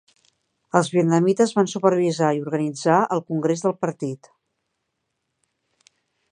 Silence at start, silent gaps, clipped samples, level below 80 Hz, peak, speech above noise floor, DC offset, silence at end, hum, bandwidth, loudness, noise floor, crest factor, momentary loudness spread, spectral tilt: 0.75 s; none; under 0.1%; -70 dBFS; -2 dBFS; 57 dB; under 0.1%; 2.15 s; none; 10.5 kHz; -21 LUFS; -77 dBFS; 22 dB; 8 LU; -6 dB/octave